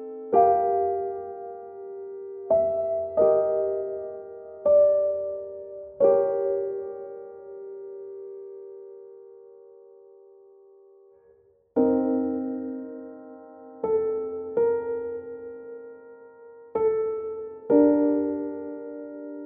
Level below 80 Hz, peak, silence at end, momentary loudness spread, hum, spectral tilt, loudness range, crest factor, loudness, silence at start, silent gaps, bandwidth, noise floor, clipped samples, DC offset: -66 dBFS; -8 dBFS; 0 s; 21 LU; none; -9.5 dB/octave; 16 LU; 20 dB; -25 LUFS; 0 s; none; 2.5 kHz; -60 dBFS; under 0.1%; under 0.1%